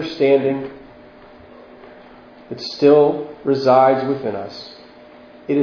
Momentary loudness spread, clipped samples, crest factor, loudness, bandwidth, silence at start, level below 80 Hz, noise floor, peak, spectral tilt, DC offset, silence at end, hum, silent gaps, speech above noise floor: 22 LU; under 0.1%; 18 dB; -17 LUFS; 5.4 kHz; 0 s; -60 dBFS; -43 dBFS; 0 dBFS; -7 dB/octave; under 0.1%; 0 s; none; none; 26 dB